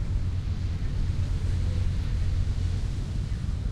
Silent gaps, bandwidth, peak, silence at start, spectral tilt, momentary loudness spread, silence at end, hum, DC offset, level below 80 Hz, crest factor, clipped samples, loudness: none; 10 kHz; -14 dBFS; 0 s; -7 dB/octave; 3 LU; 0 s; none; under 0.1%; -30 dBFS; 12 dB; under 0.1%; -30 LUFS